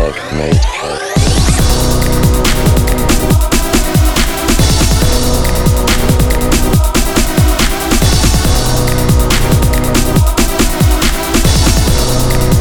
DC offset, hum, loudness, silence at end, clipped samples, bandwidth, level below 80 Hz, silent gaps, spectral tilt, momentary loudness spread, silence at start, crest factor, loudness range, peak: under 0.1%; none; -11 LUFS; 0 s; under 0.1%; over 20 kHz; -14 dBFS; none; -4.5 dB/octave; 3 LU; 0 s; 10 dB; 0 LU; 0 dBFS